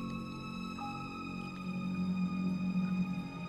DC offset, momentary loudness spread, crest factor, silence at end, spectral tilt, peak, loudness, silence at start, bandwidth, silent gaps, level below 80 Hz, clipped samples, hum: under 0.1%; 7 LU; 12 dB; 0 s; -7.5 dB/octave; -24 dBFS; -37 LUFS; 0 s; 8.2 kHz; none; -60 dBFS; under 0.1%; none